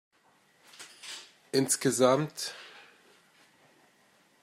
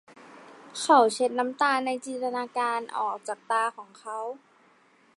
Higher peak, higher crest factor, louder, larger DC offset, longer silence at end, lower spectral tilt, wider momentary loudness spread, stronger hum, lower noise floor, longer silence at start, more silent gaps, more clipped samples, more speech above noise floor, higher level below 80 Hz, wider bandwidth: second, -10 dBFS vs -6 dBFS; about the same, 24 dB vs 22 dB; about the same, -28 LUFS vs -26 LUFS; neither; first, 1.65 s vs 0.8 s; first, -3.5 dB/octave vs -2 dB/octave; first, 24 LU vs 18 LU; neither; first, -66 dBFS vs -61 dBFS; first, 0.8 s vs 0.2 s; neither; neither; first, 39 dB vs 35 dB; about the same, -82 dBFS vs -86 dBFS; first, 16 kHz vs 11.5 kHz